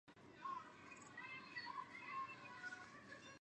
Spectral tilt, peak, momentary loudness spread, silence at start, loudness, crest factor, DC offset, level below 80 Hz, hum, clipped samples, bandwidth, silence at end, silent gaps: -3 dB/octave; -38 dBFS; 8 LU; 0.05 s; -53 LUFS; 16 dB; under 0.1%; -86 dBFS; none; under 0.1%; 10 kHz; 0 s; none